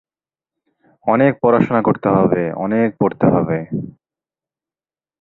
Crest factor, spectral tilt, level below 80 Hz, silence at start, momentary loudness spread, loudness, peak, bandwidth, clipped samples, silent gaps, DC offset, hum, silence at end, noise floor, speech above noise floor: 16 dB; -11 dB/octave; -52 dBFS; 1.05 s; 11 LU; -16 LUFS; -2 dBFS; 4.1 kHz; under 0.1%; none; under 0.1%; none; 1.3 s; under -90 dBFS; over 74 dB